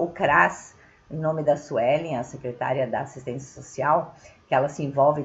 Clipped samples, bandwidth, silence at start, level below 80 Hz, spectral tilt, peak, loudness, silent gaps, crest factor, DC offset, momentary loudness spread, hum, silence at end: under 0.1%; 8 kHz; 0 s; -58 dBFS; -6 dB/octave; -4 dBFS; -24 LUFS; none; 22 dB; under 0.1%; 16 LU; none; 0 s